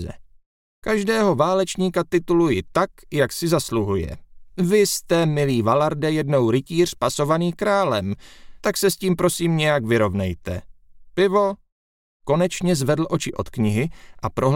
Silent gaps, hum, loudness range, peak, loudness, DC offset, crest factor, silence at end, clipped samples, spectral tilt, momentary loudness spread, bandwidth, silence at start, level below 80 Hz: 0.46-0.82 s, 11.72-12.20 s; none; 3 LU; -4 dBFS; -21 LUFS; under 0.1%; 16 dB; 0 s; under 0.1%; -5.5 dB/octave; 11 LU; 17 kHz; 0 s; -46 dBFS